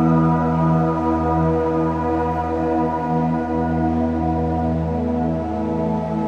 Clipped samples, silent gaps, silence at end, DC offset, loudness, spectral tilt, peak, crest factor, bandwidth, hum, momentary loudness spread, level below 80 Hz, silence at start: under 0.1%; none; 0 s; under 0.1%; -20 LUFS; -10 dB/octave; -6 dBFS; 12 dB; 6.6 kHz; none; 4 LU; -34 dBFS; 0 s